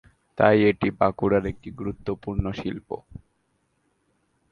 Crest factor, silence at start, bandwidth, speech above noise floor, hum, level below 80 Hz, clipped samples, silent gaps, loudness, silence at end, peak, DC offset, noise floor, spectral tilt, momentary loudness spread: 24 dB; 0.35 s; 6.6 kHz; 47 dB; none; -44 dBFS; under 0.1%; none; -24 LUFS; 1.4 s; -2 dBFS; under 0.1%; -71 dBFS; -8.5 dB/octave; 17 LU